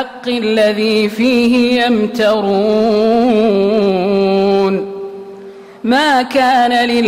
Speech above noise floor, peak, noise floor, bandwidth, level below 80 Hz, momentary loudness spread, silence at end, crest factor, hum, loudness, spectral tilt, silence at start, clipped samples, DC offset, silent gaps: 22 dB; -4 dBFS; -34 dBFS; 15.5 kHz; -50 dBFS; 8 LU; 0 s; 10 dB; none; -12 LUFS; -5.5 dB/octave; 0 s; under 0.1%; under 0.1%; none